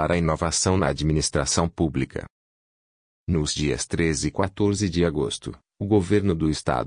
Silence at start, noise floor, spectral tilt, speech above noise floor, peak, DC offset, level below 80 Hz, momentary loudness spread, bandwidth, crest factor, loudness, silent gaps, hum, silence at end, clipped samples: 0 s; under -90 dBFS; -5 dB/octave; over 67 dB; -6 dBFS; under 0.1%; -42 dBFS; 8 LU; 10 kHz; 18 dB; -23 LUFS; 2.30-3.26 s; none; 0 s; under 0.1%